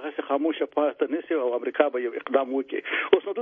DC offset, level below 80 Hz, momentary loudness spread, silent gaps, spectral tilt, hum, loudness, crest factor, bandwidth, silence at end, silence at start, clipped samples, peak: under 0.1%; -76 dBFS; 5 LU; none; -7 dB/octave; none; -26 LUFS; 22 dB; 3.7 kHz; 0 s; 0 s; under 0.1%; -4 dBFS